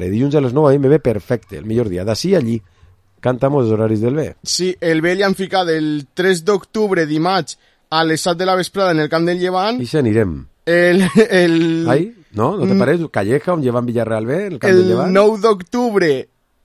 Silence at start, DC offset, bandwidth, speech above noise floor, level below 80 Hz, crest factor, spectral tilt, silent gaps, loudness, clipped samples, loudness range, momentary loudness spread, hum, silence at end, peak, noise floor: 0 s; under 0.1%; 13.5 kHz; 35 dB; -46 dBFS; 16 dB; -6 dB/octave; none; -16 LUFS; under 0.1%; 3 LU; 8 LU; none; 0.4 s; 0 dBFS; -50 dBFS